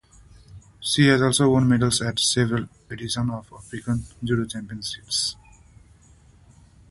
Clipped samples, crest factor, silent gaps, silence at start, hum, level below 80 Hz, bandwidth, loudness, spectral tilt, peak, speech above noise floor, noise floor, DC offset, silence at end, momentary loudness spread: under 0.1%; 22 dB; none; 0.55 s; none; -50 dBFS; 12 kHz; -22 LUFS; -4.5 dB/octave; -2 dBFS; 31 dB; -53 dBFS; under 0.1%; 1.55 s; 15 LU